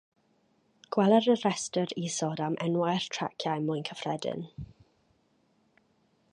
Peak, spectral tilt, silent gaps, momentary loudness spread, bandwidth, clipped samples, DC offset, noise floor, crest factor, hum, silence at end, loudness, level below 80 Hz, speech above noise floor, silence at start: -10 dBFS; -5 dB/octave; none; 13 LU; 11.5 kHz; under 0.1%; under 0.1%; -70 dBFS; 20 dB; none; 1.65 s; -29 LUFS; -64 dBFS; 41 dB; 0.9 s